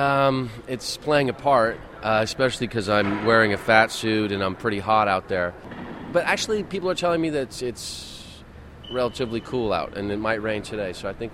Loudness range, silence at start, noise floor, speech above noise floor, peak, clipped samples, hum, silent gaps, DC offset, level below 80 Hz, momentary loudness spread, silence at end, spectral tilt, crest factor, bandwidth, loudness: 7 LU; 0 s; -43 dBFS; 20 dB; -2 dBFS; under 0.1%; none; none; under 0.1%; -48 dBFS; 13 LU; 0 s; -4.5 dB/octave; 22 dB; 15.5 kHz; -23 LUFS